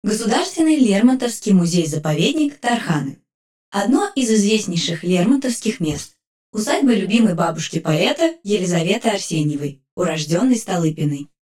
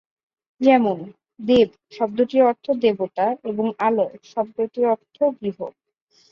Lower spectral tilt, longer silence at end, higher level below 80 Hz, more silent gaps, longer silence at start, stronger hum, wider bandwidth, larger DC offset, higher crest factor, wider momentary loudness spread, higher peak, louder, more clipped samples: second, -5 dB/octave vs -7 dB/octave; second, 0.25 s vs 0.6 s; about the same, -56 dBFS vs -60 dBFS; first, 3.34-3.72 s, 6.27-6.53 s, 9.91-9.97 s vs none; second, 0.05 s vs 0.6 s; neither; first, 16 kHz vs 7 kHz; neither; about the same, 16 dB vs 18 dB; second, 8 LU vs 12 LU; about the same, -2 dBFS vs -4 dBFS; first, -18 LUFS vs -21 LUFS; neither